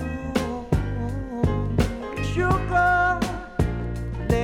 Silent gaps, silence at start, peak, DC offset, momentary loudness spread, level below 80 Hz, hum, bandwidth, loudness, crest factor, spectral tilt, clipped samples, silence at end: none; 0 s; -6 dBFS; under 0.1%; 9 LU; -32 dBFS; none; 16.5 kHz; -24 LUFS; 18 dB; -6.5 dB/octave; under 0.1%; 0 s